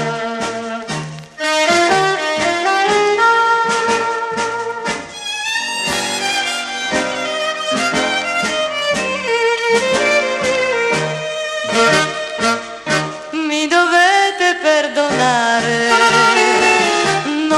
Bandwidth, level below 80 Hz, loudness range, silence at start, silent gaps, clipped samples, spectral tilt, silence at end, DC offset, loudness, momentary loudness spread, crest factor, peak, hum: 14 kHz; -54 dBFS; 5 LU; 0 s; none; under 0.1%; -2.5 dB/octave; 0 s; under 0.1%; -15 LUFS; 10 LU; 16 dB; 0 dBFS; none